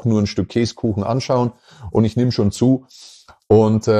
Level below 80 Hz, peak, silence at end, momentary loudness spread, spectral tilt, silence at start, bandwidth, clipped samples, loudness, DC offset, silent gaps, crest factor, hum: -46 dBFS; -4 dBFS; 0 s; 7 LU; -7 dB/octave; 0 s; 10 kHz; under 0.1%; -18 LUFS; under 0.1%; none; 14 dB; none